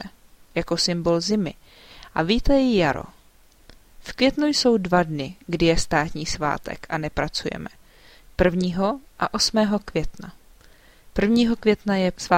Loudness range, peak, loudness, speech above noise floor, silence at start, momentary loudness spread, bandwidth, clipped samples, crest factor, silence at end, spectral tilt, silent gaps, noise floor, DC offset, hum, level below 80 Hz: 3 LU; -4 dBFS; -22 LUFS; 32 dB; 0 s; 12 LU; 16 kHz; under 0.1%; 20 dB; 0 s; -4.5 dB/octave; none; -53 dBFS; under 0.1%; none; -38 dBFS